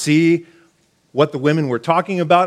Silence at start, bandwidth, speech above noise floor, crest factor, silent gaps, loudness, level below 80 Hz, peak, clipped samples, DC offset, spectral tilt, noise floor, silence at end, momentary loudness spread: 0 s; 13.5 kHz; 43 dB; 16 dB; none; -17 LUFS; -66 dBFS; 0 dBFS; under 0.1%; under 0.1%; -6 dB/octave; -58 dBFS; 0 s; 5 LU